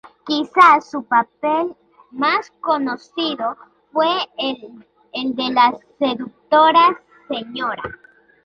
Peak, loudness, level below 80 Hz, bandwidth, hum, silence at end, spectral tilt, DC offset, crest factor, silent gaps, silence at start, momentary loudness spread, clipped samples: -2 dBFS; -18 LUFS; -62 dBFS; 9 kHz; none; 0.5 s; -4.5 dB/octave; under 0.1%; 18 dB; none; 0.25 s; 17 LU; under 0.1%